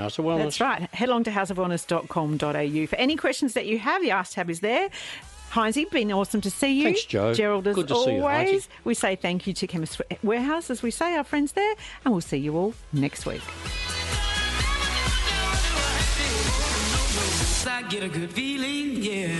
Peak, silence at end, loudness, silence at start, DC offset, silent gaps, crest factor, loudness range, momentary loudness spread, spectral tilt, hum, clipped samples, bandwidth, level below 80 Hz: -8 dBFS; 0 s; -25 LUFS; 0 s; under 0.1%; none; 18 dB; 3 LU; 6 LU; -4 dB/octave; none; under 0.1%; 12.5 kHz; -36 dBFS